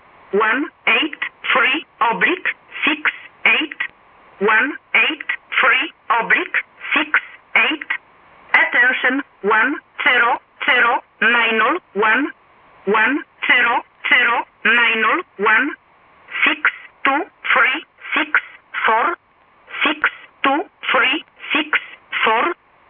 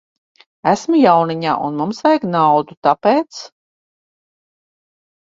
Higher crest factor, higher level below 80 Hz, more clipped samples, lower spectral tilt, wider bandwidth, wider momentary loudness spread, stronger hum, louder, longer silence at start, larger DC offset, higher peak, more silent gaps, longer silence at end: about the same, 16 dB vs 18 dB; about the same, -64 dBFS vs -62 dBFS; neither; about the same, -6 dB/octave vs -6 dB/octave; second, 5.4 kHz vs 7.8 kHz; about the same, 9 LU vs 9 LU; neither; about the same, -16 LUFS vs -15 LUFS; second, 0.35 s vs 0.65 s; neither; about the same, -2 dBFS vs 0 dBFS; second, none vs 2.77-2.82 s; second, 0.35 s vs 1.9 s